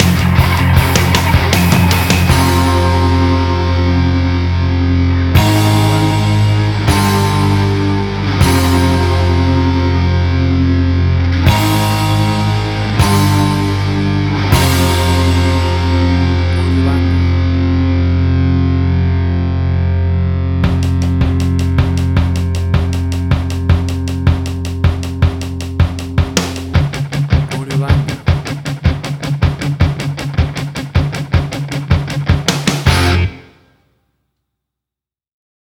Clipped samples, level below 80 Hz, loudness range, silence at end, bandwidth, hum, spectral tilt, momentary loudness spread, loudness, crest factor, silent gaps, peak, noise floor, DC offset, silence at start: under 0.1%; -22 dBFS; 4 LU; 2.25 s; 17.5 kHz; none; -6 dB/octave; 6 LU; -13 LUFS; 12 dB; none; 0 dBFS; -87 dBFS; under 0.1%; 0 s